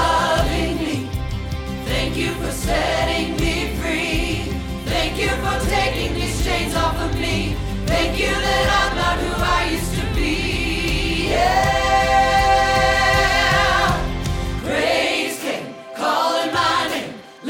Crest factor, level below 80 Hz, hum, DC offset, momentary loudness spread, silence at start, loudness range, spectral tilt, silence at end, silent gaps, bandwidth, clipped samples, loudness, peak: 16 dB; -28 dBFS; none; under 0.1%; 9 LU; 0 s; 5 LU; -4 dB/octave; 0 s; none; 17.5 kHz; under 0.1%; -19 LUFS; -2 dBFS